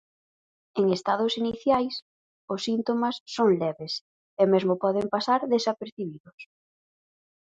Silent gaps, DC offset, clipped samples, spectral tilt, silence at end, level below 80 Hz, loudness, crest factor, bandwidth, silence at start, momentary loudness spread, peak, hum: 2.02-2.48 s, 3.20-3.26 s, 4.01-4.37 s, 5.92-5.97 s, 6.20-6.24 s, 6.33-6.38 s; under 0.1%; under 0.1%; -5.5 dB/octave; 1.05 s; -68 dBFS; -26 LUFS; 20 dB; 9 kHz; 0.75 s; 12 LU; -8 dBFS; none